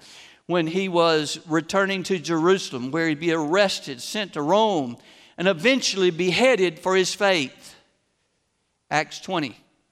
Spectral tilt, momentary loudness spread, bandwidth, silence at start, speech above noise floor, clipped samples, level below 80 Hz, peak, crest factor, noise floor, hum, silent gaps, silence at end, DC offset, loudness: -4 dB/octave; 8 LU; 14.5 kHz; 0.1 s; 50 dB; under 0.1%; -68 dBFS; -6 dBFS; 18 dB; -72 dBFS; none; none; 0.4 s; under 0.1%; -22 LUFS